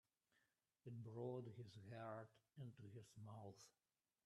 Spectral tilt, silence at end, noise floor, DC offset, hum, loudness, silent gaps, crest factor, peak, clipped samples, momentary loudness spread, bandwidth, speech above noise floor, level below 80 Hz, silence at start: -7 dB/octave; 0.55 s; -88 dBFS; under 0.1%; none; -57 LUFS; none; 18 dB; -38 dBFS; under 0.1%; 10 LU; 12.5 kHz; 31 dB; under -90 dBFS; 0.85 s